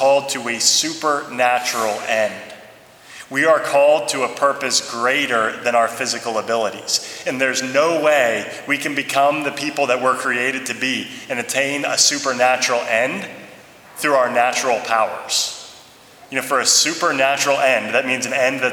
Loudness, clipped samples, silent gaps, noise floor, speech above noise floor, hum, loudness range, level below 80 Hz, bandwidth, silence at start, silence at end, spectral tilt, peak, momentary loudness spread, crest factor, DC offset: -18 LUFS; under 0.1%; none; -45 dBFS; 26 dB; none; 2 LU; -68 dBFS; 19.5 kHz; 0 s; 0 s; -1.5 dB/octave; 0 dBFS; 10 LU; 18 dB; under 0.1%